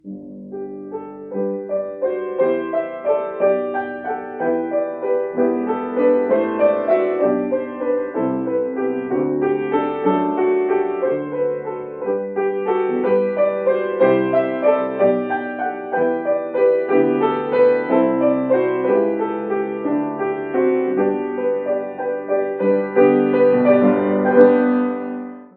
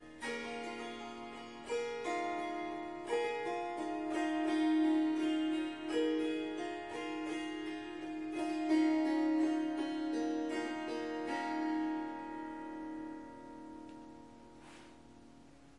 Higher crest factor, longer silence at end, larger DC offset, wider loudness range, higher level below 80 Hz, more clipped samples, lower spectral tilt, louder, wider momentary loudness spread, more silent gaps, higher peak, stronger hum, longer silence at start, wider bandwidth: about the same, 18 dB vs 14 dB; about the same, 0.1 s vs 0 s; neither; second, 4 LU vs 8 LU; first, -64 dBFS vs -72 dBFS; neither; first, -11 dB/octave vs -4.5 dB/octave; first, -19 LUFS vs -37 LUFS; second, 10 LU vs 18 LU; neither; first, 0 dBFS vs -22 dBFS; neither; about the same, 0.05 s vs 0 s; second, 4.3 kHz vs 11 kHz